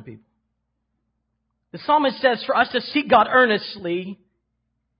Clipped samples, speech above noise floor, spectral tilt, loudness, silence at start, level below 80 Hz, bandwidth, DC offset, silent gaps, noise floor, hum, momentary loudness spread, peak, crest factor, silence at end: under 0.1%; 55 dB; -9 dB/octave; -19 LUFS; 0.05 s; -62 dBFS; 5.4 kHz; under 0.1%; none; -75 dBFS; none; 12 LU; -2 dBFS; 20 dB; 0.85 s